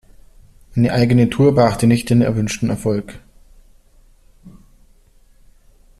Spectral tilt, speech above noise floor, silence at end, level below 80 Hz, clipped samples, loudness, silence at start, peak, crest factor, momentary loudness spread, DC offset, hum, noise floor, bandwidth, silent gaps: -7 dB/octave; 35 dB; 1.5 s; -42 dBFS; under 0.1%; -16 LUFS; 0.75 s; -2 dBFS; 16 dB; 10 LU; under 0.1%; none; -50 dBFS; 13.5 kHz; none